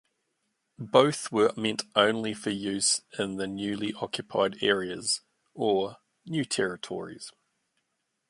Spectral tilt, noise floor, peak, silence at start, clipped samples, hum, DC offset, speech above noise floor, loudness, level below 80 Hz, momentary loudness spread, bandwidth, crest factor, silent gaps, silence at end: -3 dB/octave; -79 dBFS; -4 dBFS; 0.8 s; under 0.1%; none; under 0.1%; 51 dB; -28 LUFS; -68 dBFS; 12 LU; 11.5 kHz; 24 dB; none; 1 s